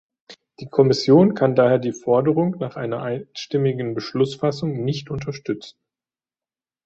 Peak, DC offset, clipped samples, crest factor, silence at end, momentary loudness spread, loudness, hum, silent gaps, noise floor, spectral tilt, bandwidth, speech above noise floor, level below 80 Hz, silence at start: -2 dBFS; under 0.1%; under 0.1%; 18 dB; 1.15 s; 14 LU; -21 LUFS; none; none; under -90 dBFS; -7 dB/octave; 8 kHz; over 70 dB; -58 dBFS; 0.3 s